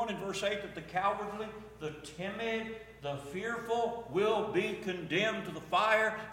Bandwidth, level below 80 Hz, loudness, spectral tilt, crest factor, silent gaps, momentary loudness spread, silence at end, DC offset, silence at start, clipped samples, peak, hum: 16.5 kHz; -64 dBFS; -34 LUFS; -4.5 dB/octave; 20 dB; none; 13 LU; 0 s; under 0.1%; 0 s; under 0.1%; -14 dBFS; none